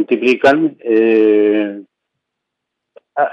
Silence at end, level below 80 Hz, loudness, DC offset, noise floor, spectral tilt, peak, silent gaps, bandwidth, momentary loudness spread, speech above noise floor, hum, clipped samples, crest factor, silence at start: 0 s; -64 dBFS; -13 LUFS; under 0.1%; -77 dBFS; -6 dB/octave; -2 dBFS; none; 7.8 kHz; 13 LU; 65 dB; none; under 0.1%; 14 dB; 0 s